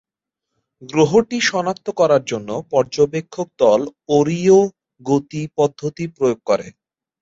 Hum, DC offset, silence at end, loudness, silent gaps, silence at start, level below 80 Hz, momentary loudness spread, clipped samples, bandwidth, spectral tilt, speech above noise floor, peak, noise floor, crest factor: none; under 0.1%; 0.5 s; -18 LUFS; none; 0.8 s; -58 dBFS; 11 LU; under 0.1%; 7.8 kHz; -5.5 dB/octave; 65 dB; -2 dBFS; -82 dBFS; 16 dB